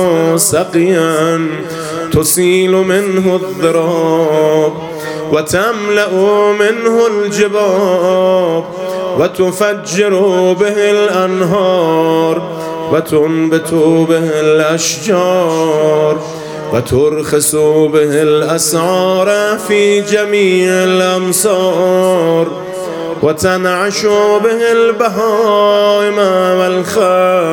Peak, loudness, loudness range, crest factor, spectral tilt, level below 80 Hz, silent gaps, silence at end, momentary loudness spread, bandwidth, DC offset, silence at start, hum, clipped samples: 0 dBFS; -11 LUFS; 1 LU; 10 dB; -4.5 dB/octave; -48 dBFS; none; 0 s; 5 LU; 18.5 kHz; under 0.1%; 0 s; none; under 0.1%